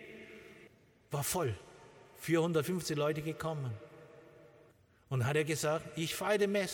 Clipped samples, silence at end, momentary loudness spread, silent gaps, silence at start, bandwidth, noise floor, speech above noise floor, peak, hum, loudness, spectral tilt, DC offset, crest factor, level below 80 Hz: under 0.1%; 0 s; 21 LU; none; 0 s; 19 kHz; -65 dBFS; 31 dB; -18 dBFS; none; -35 LUFS; -5 dB/octave; under 0.1%; 18 dB; -68 dBFS